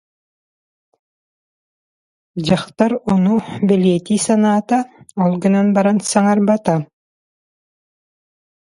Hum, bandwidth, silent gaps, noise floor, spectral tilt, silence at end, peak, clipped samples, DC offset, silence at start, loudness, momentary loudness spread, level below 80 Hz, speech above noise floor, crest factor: none; 11.5 kHz; none; under -90 dBFS; -6 dB/octave; 1.9 s; 0 dBFS; under 0.1%; under 0.1%; 2.35 s; -16 LUFS; 6 LU; -54 dBFS; over 75 dB; 18 dB